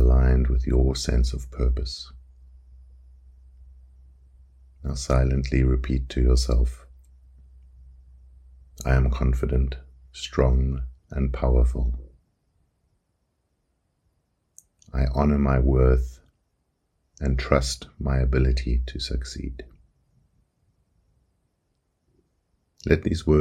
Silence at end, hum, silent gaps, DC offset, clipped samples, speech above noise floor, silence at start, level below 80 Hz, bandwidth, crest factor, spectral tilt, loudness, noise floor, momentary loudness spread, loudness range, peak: 0 s; none; none; under 0.1%; under 0.1%; 51 dB; 0 s; -26 dBFS; 9.6 kHz; 22 dB; -6.5 dB/octave; -24 LUFS; -73 dBFS; 14 LU; 10 LU; -2 dBFS